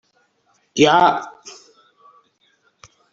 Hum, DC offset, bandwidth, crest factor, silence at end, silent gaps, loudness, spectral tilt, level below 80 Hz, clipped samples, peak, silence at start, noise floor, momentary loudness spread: none; under 0.1%; 7.8 kHz; 20 dB; 1.6 s; none; -16 LUFS; -4 dB/octave; -62 dBFS; under 0.1%; -2 dBFS; 0.75 s; -63 dBFS; 27 LU